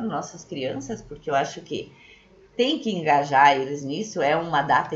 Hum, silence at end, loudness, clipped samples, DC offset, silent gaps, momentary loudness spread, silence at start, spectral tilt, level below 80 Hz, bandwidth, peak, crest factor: none; 0 s; -23 LUFS; under 0.1%; under 0.1%; none; 17 LU; 0 s; -4.5 dB/octave; -58 dBFS; 8 kHz; -4 dBFS; 20 dB